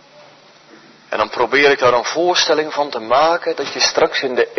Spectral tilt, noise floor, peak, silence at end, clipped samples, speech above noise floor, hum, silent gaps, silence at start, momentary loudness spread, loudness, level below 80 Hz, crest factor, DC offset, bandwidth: -2 dB/octave; -45 dBFS; -2 dBFS; 0 s; under 0.1%; 30 dB; none; none; 1.1 s; 9 LU; -15 LUFS; -56 dBFS; 16 dB; under 0.1%; 6.4 kHz